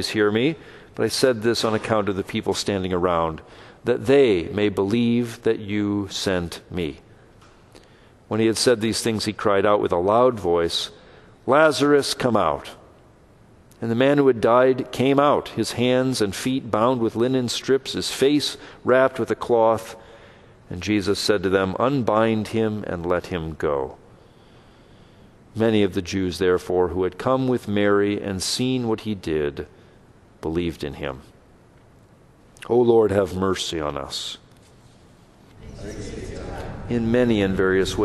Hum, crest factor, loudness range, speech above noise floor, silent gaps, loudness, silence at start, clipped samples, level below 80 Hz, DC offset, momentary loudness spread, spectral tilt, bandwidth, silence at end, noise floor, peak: none; 18 dB; 7 LU; 31 dB; none; -21 LUFS; 0 s; under 0.1%; -48 dBFS; under 0.1%; 14 LU; -5 dB/octave; 12.5 kHz; 0 s; -52 dBFS; -4 dBFS